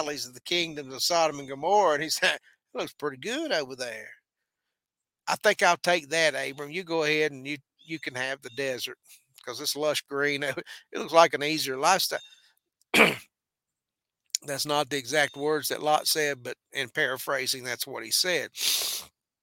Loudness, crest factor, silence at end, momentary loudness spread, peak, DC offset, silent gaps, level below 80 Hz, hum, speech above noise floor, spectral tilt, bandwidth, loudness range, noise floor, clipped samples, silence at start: -27 LUFS; 26 dB; 0.35 s; 14 LU; -2 dBFS; under 0.1%; none; -74 dBFS; none; 62 dB; -2 dB/octave; 17 kHz; 6 LU; -90 dBFS; under 0.1%; 0 s